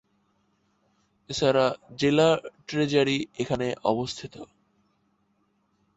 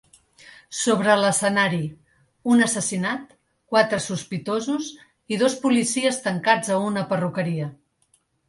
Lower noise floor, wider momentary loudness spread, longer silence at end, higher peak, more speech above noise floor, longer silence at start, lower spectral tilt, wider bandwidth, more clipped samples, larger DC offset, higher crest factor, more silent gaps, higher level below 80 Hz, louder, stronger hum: first, -70 dBFS vs -65 dBFS; about the same, 13 LU vs 11 LU; first, 1.55 s vs 0.75 s; second, -8 dBFS vs -4 dBFS; about the same, 45 dB vs 44 dB; first, 1.3 s vs 0.45 s; about the same, -5 dB/octave vs -4 dB/octave; second, 8.2 kHz vs 11.5 kHz; neither; neither; about the same, 20 dB vs 20 dB; neither; about the same, -60 dBFS vs -64 dBFS; second, -25 LUFS vs -22 LUFS; neither